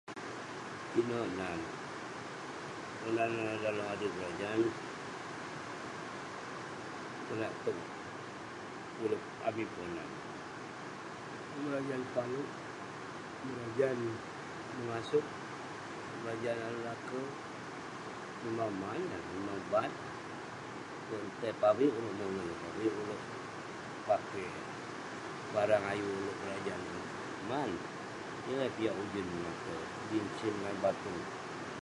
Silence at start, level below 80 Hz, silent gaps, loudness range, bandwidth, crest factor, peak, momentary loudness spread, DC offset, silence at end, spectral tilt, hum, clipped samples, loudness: 0.05 s; -68 dBFS; none; 5 LU; 11.5 kHz; 22 dB; -16 dBFS; 10 LU; under 0.1%; 0 s; -5.5 dB/octave; none; under 0.1%; -39 LUFS